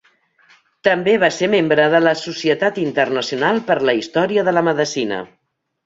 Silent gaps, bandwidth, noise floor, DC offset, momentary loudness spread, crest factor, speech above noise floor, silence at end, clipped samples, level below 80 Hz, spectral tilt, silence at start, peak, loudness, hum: none; 7.8 kHz; -57 dBFS; under 0.1%; 6 LU; 16 dB; 40 dB; 0.6 s; under 0.1%; -62 dBFS; -4.5 dB/octave; 0.85 s; -2 dBFS; -17 LUFS; none